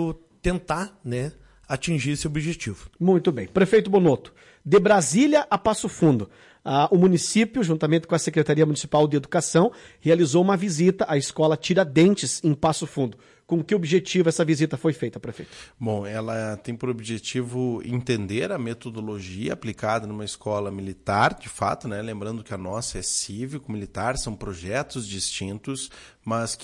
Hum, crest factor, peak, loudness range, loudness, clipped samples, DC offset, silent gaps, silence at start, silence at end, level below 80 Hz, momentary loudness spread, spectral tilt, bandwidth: none; 16 dB; -8 dBFS; 8 LU; -24 LUFS; under 0.1%; under 0.1%; none; 0 s; 0 s; -48 dBFS; 14 LU; -5.5 dB/octave; 11.5 kHz